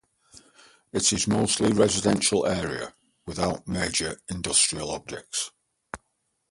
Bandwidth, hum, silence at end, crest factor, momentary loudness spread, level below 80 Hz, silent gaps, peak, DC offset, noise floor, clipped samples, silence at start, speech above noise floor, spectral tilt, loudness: 11.5 kHz; none; 0.55 s; 20 dB; 18 LU; -50 dBFS; none; -6 dBFS; under 0.1%; -75 dBFS; under 0.1%; 0.35 s; 50 dB; -3 dB/octave; -25 LUFS